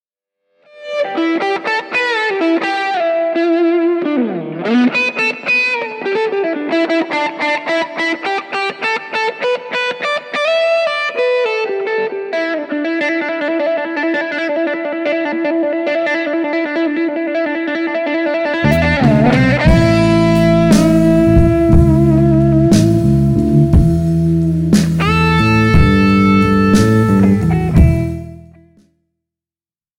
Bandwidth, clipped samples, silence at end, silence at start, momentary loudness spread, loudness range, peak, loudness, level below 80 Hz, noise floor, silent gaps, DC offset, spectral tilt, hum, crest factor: 14.5 kHz; under 0.1%; 1.6 s; 0.75 s; 8 LU; 6 LU; 0 dBFS; -14 LUFS; -26 dBFS; under -90 dBFS; none; under 0.1%; -7 dB/octave; none; 14 dB